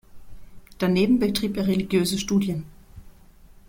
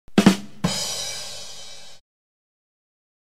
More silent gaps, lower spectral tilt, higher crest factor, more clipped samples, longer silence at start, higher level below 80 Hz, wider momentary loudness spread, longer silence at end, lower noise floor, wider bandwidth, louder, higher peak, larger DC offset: neither; about the same, -5.5 dB/octave vs -4.5 dB/octave; second, 16 dB vs 26 dB; neither; about the same, 0.15 s vs 0.15 s; first, -48 dBFS vs -54 dBFS; second, 9 LU vs 21 LU; second, 0.6 s vs 1.35 s; first, -49 dBFS vs -42 dBFS; about the same, 16.5 kHz vs 15.5 kHz; about the same, -23 LUFS vs -23 LUFS; second, -10 dBFS vs 0 dBFS; second, under 0.1% vs 1%